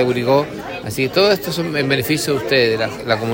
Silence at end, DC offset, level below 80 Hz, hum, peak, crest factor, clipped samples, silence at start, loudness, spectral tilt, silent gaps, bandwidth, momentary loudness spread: 0 s; under 0.1%; -50 dBFS; none; -2 dBFS; 16 dB; under 0.1%; 0 s; -17 LUFS; -4.5 dB/octave; none; 16.5 kHz; 7 LU